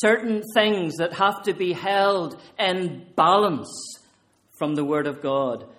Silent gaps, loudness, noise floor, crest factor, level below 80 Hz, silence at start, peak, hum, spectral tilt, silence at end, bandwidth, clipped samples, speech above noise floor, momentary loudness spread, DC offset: none; -23 LUFS; -61 dBFS; 20 dB; -68 dBFS; 0 s; -4 dBFS; none; -4.5 dB/octave; 0.05 s; 16 kHz; under 0.1%; 39 dB; 11 LU; under 0.1%